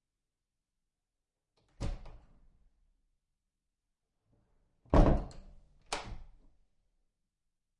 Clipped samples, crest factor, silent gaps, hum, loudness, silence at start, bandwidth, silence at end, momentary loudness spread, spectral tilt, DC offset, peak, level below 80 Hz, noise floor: under 0.1%; 26 dB; none; none; -33 LUFS; 1.8 s; 10.5 kHz; 1.55 s; 23 LU; -7 dB/octave; under 0.1%; -12 dBFS; -40 dBFS; -89 dBFS